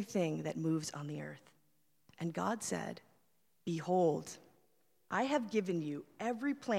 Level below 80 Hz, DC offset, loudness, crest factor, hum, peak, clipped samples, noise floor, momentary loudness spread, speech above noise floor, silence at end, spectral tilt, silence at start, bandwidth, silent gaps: -80 dBFS; under 0.1%; -37 LUFS; 18 dB; none; -20 dBFS; under 0.1%; -78 dBFS; 14 LU; 41 dB; 0 s; -5.5 dB/octave; 0 s; 16.5 kHz; none